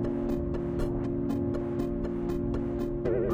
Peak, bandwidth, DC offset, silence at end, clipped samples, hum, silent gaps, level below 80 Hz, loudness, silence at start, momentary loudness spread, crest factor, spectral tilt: -16 dBFS; 16 kHz; under 0.1%; 0 s; under 0.1%; none; none; -40 dBFS; -31 LUFS; 0 s; 2 LU; 14 dB; -9.5 dB/octave